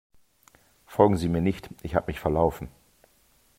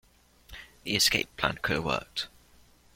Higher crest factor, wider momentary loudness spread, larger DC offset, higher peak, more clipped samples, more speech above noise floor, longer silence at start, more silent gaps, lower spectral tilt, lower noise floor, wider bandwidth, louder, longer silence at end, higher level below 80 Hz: about the same, 24 dB vs 24 dB; second, 14 LU vs 24 LU; neither; first, -4 dBFS vs -8 dBFS; neither; first, 39 dB vs 30 dB; first, 0.9 s vs 0.5 s; neither; first, -7.5 dB/octave vs -2.5 dB/octave; first, -63 dBFS vs -59 dBFS; about the same, 16 kHz vs 16.5 kHz; about the same, -26 LUFS vs -28 LUFS; first, 0.9 s vs 0.7 s; first, -46 dBFS vs -54 dBFS